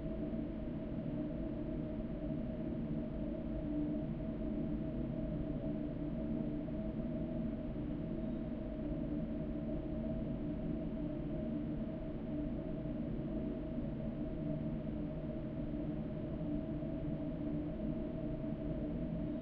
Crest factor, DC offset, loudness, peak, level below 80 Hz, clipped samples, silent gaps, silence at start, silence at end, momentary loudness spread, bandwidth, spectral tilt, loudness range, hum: 12 dB; under 0.1%; -41 LUFS; -28 dBFS; -48 dBFS; under 0.1%; none; 0 s; 0 s; 2 LU; 4.9 kHz; -9.5 dB/octave; 1 LU; none